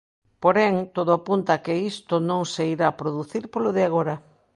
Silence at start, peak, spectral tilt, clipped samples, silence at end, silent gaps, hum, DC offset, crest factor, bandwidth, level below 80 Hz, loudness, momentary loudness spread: 0.4 s; -4 dBFS; -6 dB/octave; under 0.1%; 0.35 s; none; none; under 0.1%; 20 dB; 11.5 kHz; -66 dBFS; -23 LUFS; 9 LU